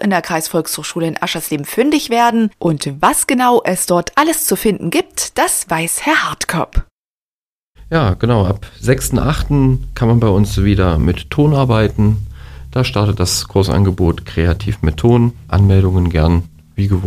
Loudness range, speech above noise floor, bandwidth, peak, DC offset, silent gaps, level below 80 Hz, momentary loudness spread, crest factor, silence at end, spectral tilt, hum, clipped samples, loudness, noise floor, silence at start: 3 LU; over 76 dB; 15.5 kHz; 0 dBFS; under 0.1%; 6.91-7.73 s; -28 dBFS; 7 LU; 14 dB; 0 s; -5.5 dB/octave; none; under 0.1%; -15 LUFS; under -90 dBFS; 0 s